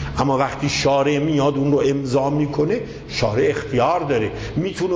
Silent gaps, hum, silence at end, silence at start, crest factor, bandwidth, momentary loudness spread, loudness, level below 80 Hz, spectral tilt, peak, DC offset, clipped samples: none; none; 0 s; 0 s; 14 dB; 8 kHz; 6 LU; -20 LUFS; -40 dBFS; -6 dB/octave; -6 dBFS; under 0.1%; under 0.1%